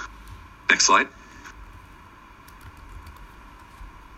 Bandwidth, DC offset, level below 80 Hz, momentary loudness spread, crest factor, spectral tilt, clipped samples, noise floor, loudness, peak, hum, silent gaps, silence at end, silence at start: 16 kHz; under 0.1%; -48 dBFS; 29 LU; 26 dB; -0.5 dB/octave; under 0.1%; -48 dBFS; -19 LUFS; -2 dBFS; none; none; 0.3 s; 0 s